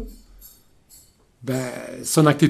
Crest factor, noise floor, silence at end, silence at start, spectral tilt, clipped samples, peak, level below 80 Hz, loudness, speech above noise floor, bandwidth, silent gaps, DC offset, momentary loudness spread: 22 dB; -53 dBFS; 0 s; 0 s; -5.5 dB/octave; under 0.1%; -2 dBFS; -48 dBFS; -23 LUFS; 33 dB; 15.5 kHz; none; under 0.1%; 23 LU